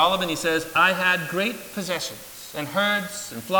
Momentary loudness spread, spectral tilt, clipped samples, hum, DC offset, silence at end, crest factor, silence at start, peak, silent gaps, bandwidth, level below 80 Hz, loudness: 14 LU; -3 dB/octave; under 0.1%; none; under 0.1%; 0 s; 18 dB; 0 s; -6 dBFS; none; 19.5 kHz; -60 dBFS; -23 LUFS